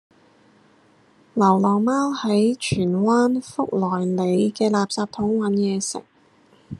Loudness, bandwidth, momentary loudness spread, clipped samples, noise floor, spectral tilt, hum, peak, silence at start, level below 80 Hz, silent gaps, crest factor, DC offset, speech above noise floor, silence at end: -21 LUFS; 11.5 kHz; 7 LU; under 0.1%; -56 dBFS; -6 dB/octave; none; -4 dBFS; 1.35 s; -60 dBFS; none; 18 dB; under 0.1%; 36 dB; 0.05 s